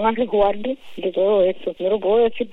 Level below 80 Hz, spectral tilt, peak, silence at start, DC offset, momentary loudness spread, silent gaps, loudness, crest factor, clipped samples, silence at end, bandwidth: -46 dBFS; -7.5 dB/octave; -6 dBFS; 0 s; under 0.1%; 9 LU; none; -20 LUFS; 14 dB; under 0.1%; 0 s; 4.1 kHz